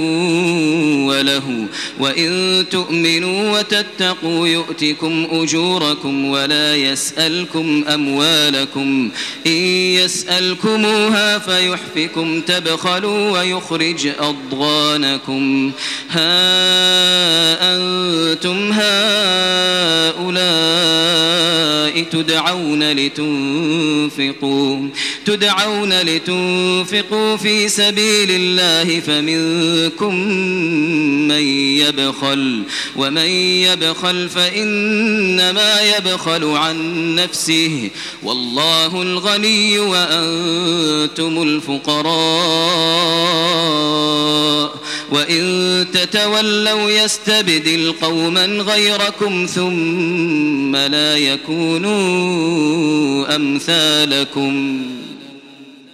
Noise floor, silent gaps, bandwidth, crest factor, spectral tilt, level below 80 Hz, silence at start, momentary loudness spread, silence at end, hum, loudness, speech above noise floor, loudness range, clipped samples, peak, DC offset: -39 dBFS; none; 16.5 kHz; 16 dB; -3 dB/octave; -58 dBFS; 0 s; 6 LU; 0.2 s; none; -14 LUFS; 24 dB; 3 LU; under 0.1%; 0 dBFS; under 0.1%